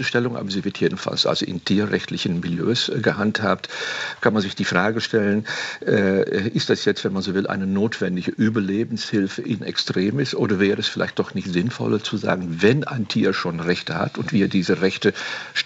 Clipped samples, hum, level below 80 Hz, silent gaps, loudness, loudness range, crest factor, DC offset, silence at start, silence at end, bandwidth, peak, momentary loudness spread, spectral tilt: under 0.1%; none; -62 dBFS; none; -22 LUFS; 1 LU; 18 dB; under 0.1%; 0 s; 0 s; 8.2 kHz; -2 dBFS; 5 LU; -5.5 dB/octave